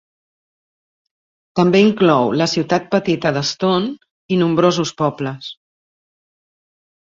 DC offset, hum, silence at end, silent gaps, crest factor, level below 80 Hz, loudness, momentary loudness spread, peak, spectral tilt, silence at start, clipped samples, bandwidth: under 0.1%; none; 1.5 s; 4.11-4.29 s; 18 dB; -58 dBFS; -17 LUFS; 13 LU; -2 dBFS; -5.5 dB/octave; 1.55 s; under 0.1%; 7.6 kHz